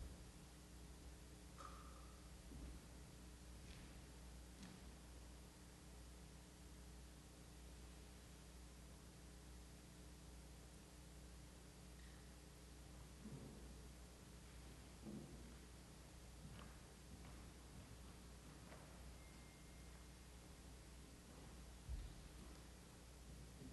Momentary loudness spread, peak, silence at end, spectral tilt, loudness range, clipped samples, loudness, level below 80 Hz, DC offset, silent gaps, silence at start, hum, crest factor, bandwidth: 4 LU; -40 dBFS; 0 s; -4.5 dB/octave; 2 LU; under 0.1%; -61 LUFS; -62 dBFS; under 0.1%; none; 0 s; 60 Hz at -65 dBFS; 18 dB; 12 kHz